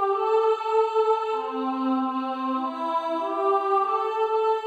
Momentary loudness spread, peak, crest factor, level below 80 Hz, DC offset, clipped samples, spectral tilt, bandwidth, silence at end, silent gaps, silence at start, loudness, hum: 5 LU; -10 dBFS; 14 dB; -76 dBFS; under 0.1%; under 0.1%; -4 dB/octave; 8 kHz; 0 s; none; 0 s; -24 LUFS; none